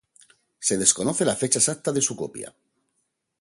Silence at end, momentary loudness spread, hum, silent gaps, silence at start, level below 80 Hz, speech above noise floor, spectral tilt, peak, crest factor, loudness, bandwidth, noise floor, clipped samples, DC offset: 0.9 s; 14 LU; none; none; 0.6 s; -62 dBFS; 52 dB; -3 dB/octave; -2 dBFS; 24 dB; -22 LUFS; 12 kHz; -76 dBFS; under 0.1%; under 0.1%